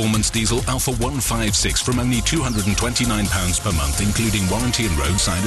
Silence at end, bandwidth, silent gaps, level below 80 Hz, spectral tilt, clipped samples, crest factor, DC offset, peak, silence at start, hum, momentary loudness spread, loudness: 0 s; 13 kHz; none; -28 dBFS; -3.5 dB/octave; under 0.1%; 12 dB; under 0.1%; -8 dBFS; 0 s; none; 2 LU; -19 LUFS